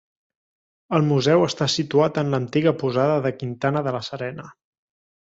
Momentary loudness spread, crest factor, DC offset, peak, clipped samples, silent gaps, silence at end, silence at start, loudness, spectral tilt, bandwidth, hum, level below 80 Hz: 10 LU; 18 dB; under 0.1%; -4 dBFS; under 0.1%; none; 0.75 s; 0.9 s; -21 LUFS; -6 dB/octave; 8 kHz; none; -60 dBFS